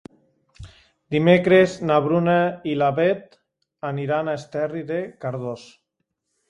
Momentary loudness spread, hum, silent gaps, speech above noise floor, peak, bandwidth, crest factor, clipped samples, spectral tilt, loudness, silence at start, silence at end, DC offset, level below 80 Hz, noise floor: 13 LU; none; none; 57 dB; -2 dBFS; 10.5 kHz; 22 dB; under 0.1%; -7 dB/octave; -21 LUFS; 0.6 s; 0.85 s; under 0.1%; -58 dBFS; -77 dBFS